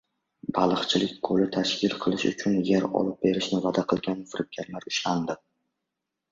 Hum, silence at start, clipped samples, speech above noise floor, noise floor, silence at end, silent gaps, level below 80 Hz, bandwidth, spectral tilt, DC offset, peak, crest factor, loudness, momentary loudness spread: none; 0.45 s; under 0.1%; 58 dB; -84 dBFS; 0.95 s; none; -62 dBFS; 7.8 kHz; -5 dB/octave; under 0.1%; -8 dBFS; 20 dB; -26 LUFS; 10 LU